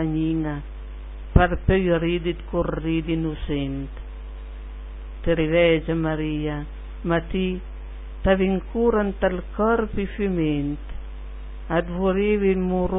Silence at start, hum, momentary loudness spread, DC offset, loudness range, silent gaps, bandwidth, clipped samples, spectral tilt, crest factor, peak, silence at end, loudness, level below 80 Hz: 0 s; none; 18 LU; under 0.1%; 2 LU; none; 3.9 kHz; under 0.1%; -11.5 dB/octave; 24 dB; 0 dBFS; 0 s; -23 LUFS; -32 dBFS